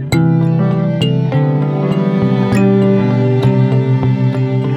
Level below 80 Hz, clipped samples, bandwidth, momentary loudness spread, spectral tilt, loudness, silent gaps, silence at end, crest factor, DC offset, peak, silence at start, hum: -44 dBFS; under 0.1%; 11 kHz; 3 LU; -8.5 dB/octave; -13 LUFS; none; 0 s; 12 dB; under 0.1%; 0 dBFS; 0 s; none